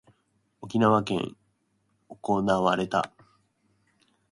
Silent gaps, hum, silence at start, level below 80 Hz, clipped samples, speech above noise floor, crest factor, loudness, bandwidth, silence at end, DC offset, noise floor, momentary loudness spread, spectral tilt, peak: none; none; 0.6 s; -62 dBFS; under 0.1%; 48 dB; 22 dB; -26 LUFS; 11.5 kHz; 1.25 s; under 0.1%; -72 dBFS; 15 LU; -6.5 dB/octave; -6 dBFS